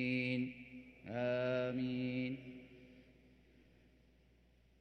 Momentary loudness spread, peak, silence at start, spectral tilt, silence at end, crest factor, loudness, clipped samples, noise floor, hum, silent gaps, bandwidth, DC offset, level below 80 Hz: 19 LU; -26 dBFS; 0 s; -8 dB/octave; 1.75 s; 16 dB; -40 LUFS; under 0.1%; -69 dBFS; none; none; 6.2 kHz; under 0.1%; -72 dBFS